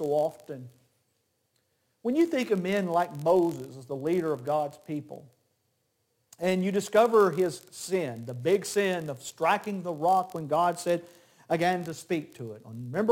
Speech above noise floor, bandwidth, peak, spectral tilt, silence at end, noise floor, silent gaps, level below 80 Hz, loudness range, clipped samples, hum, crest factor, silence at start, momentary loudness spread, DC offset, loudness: 47 dB; 17 kHz; -10 dBFS; -5.5 dB/octave; 0 s; -75 dBFS; none; -74 dBFS; 4 LU; under 0.1%; none; 18 dB; 0 s; 14 LU; under 0.1%; -28 LUFS